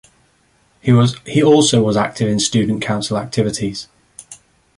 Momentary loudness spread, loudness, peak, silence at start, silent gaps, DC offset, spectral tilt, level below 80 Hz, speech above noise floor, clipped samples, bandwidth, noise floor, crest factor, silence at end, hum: 16 LU; -16 LUFS; -2 dBFS; 0.85 s; none; under 0.1%; -5 dB/octave; -48 dBFS; 42 dB; under 0.1%; 11.5 kHz; -57 dBFS; 16 dB; 0.45 s; none